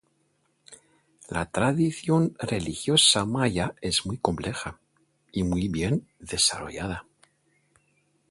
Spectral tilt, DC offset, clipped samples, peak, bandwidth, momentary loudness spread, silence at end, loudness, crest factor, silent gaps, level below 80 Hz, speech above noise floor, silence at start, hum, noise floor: -3.5 dB/octave; under 0.1%; under 0.1%; -4 dBFS; 11.5 kHz; 15 LU; 1.3 s; -25 LUFS; 22 dB; none; -48 dBFS; 44 dB; 0.7 s; none; -70 dBFS